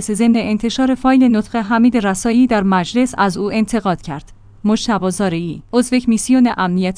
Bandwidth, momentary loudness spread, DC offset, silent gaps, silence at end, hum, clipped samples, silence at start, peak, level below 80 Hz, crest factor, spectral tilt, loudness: 10.5 kHz; 6 LU; under 0.1%; none; 0 s; none; under 0.1%; 0 s; 0 dBFS; -42 dBFS; 14 dB; -5.5 dB/octave; -15 LUFS